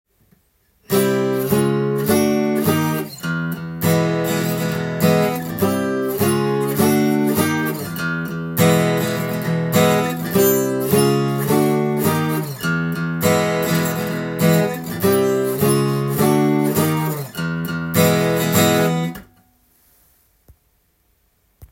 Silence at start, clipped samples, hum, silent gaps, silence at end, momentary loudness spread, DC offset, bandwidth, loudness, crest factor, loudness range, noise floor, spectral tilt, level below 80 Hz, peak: 0.9 s; under 0.1%; none; none; 0.05 s; 8 LU; under 0.1%; 17 kHz; -18 LUFS; 16 dB; 2 LU; -62 dBFS; -5.5 dB/octave; -56 dBFS; -2 dBFS